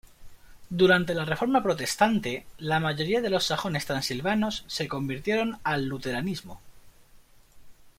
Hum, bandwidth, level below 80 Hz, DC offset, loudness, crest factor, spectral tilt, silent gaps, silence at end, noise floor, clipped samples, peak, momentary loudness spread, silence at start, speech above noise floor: none; 16.5 kHz; -54 dBFS; under 0.1%; -27 LUFS; 22 dB; -4.5 dB/octave; none; 0.1 s; -54 dBFS; under 0.1%; -6 dBFS; 8 LU; 0.2 s; 28 dB